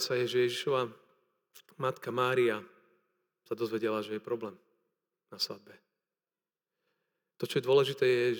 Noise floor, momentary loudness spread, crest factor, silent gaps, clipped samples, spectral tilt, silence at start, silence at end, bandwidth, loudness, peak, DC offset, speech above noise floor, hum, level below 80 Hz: under -90 dBFS; 13 LU; 20 dB; none; under 0.1%; -5 dB/octave; 0 s; 0 s; over 20 kHz; -32 LUFS; -14 dBFS; under 0.1%; over 59 dB; none; under -90 dBFS